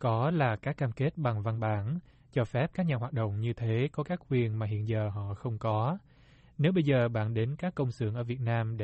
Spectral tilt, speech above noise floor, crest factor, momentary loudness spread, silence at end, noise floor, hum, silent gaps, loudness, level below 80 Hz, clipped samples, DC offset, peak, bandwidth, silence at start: -9 dB/octave; 29 dB; 16 dB; 7 LU; 0 s; -59 dBFS; none; none; -31 LUFS; -60 dBFS; under 0.1%; under 0.1%; -14 dBFS; 8 kHz; 0 s